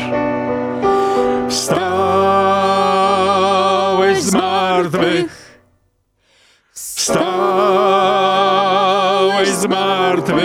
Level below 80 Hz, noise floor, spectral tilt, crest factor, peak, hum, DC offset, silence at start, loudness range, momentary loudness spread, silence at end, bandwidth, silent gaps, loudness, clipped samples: -52 dBFS; -61 dBFS; -4 dB/octave; 14 dB; -2 dBFS; none; under 0.1%; 0 s; 4 LU; 5 LU; 0 s; 16 kHz; none; -14 LUFS; under 0.1%